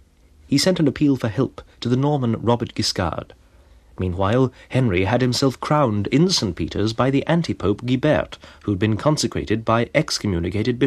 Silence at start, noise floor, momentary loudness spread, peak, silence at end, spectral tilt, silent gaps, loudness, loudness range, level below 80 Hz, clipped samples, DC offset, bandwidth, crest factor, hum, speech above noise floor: 0.5 s; -51 dBFS; 6 LU; -2 dBFS; 0 s; -5.5 dB/octave; none; -20 LUFS; 3 LU; -44 dBFS; under 0.1%; under 0.1%; 14.5 kHz; 18 dB; none; 31 dB